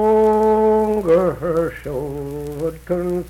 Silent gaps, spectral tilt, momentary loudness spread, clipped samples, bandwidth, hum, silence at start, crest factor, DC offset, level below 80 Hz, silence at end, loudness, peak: none; -8 dB/octave; 12 LU; under 0.1%; 15.5 kHz; none; 0 s; 12 dB; under 0.1%; -40 dBFS; 0 s; -19 LUFS; -6 dBFS